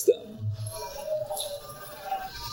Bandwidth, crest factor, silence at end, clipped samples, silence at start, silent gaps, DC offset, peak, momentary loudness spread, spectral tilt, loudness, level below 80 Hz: 18 kHz; 22 dB; 0 s; under 0.1%; 0 s; none; under 0.1%; -10 dBFS; 8 LU; -4.5 dB/octave; -33 LUFS; -54 dBFS